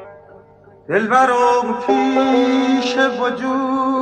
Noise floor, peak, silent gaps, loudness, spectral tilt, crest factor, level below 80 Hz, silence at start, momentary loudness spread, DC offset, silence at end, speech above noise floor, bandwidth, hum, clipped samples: -45 dBFS; -2 dBFS; none; -16 LUFS; -4.5 dB/octave; 14 dB; -60 dBFS; 0 s; 6 LU; under 0.1%; 0 s; 29 dB; 9 kHz; none; under 0.1%